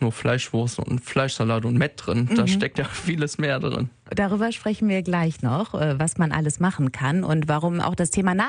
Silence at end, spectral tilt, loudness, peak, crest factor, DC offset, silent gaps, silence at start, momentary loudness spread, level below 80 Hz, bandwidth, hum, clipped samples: 0 s; -5.5 dB/octave; -23 LUFS; -8 dBFS; 16 dB; under 0.1%; none; 0 s; 4 LU; -50 dBFS; 10.5 kHz; none; under 0.1%